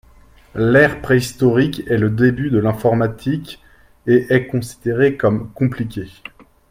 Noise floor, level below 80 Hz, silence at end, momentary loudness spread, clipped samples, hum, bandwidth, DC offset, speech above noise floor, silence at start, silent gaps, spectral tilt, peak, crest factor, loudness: -47 dBFS; -44 dBFS; 0.6 s; 15 LU; under 0.1%; none; 16 kHz; under 0.1%; 31 dB; 0.55 s; none; -7 dB/octave; 0 dBFS; 18 dB; -17 LUFS